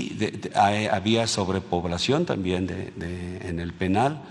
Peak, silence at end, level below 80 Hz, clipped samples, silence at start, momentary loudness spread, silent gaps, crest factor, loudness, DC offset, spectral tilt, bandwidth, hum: -6 dBFS; 0 s; -50 dBFS; under 0.1%; 0 s; 11 LU; none; 18 dB; -25 LUFS; under 0.1%; -5 dB/octave; 12 kHz; none